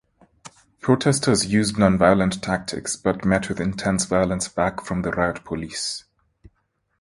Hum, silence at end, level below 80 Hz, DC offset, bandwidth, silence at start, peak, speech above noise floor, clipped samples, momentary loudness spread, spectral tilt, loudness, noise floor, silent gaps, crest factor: none; 1 s; -44 dBFS; under 0.1%; 11.5 kHz; 0.45 s; 0 dBFS; 50 dB; under 0.1%; 10 LU; -5 dB/octave; -22 LUFS; -71 dBFS; none; 22 dB